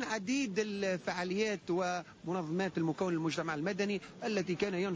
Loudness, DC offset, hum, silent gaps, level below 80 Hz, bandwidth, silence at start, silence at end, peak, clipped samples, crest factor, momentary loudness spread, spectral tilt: -35 LUFS; under 0.1%; none; none; -70 dBFS; 8 kHz; 0 s; 0 s; -22 dBFS; under 0.1%; 12 dB; 3 LU; -5 dB/octave